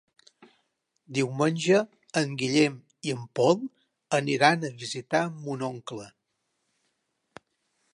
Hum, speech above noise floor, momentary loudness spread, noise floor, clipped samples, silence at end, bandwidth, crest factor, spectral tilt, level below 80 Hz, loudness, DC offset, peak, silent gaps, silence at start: none; 52 dB; 13 LU; -78 dBFS; under 0.1%; 1.85 s; 11.5 kHz; 24 dB; -5 dB/octave; -76 dBFS; -27 LUFS; under 0.1%; -4 dBFS; none; 1.1 s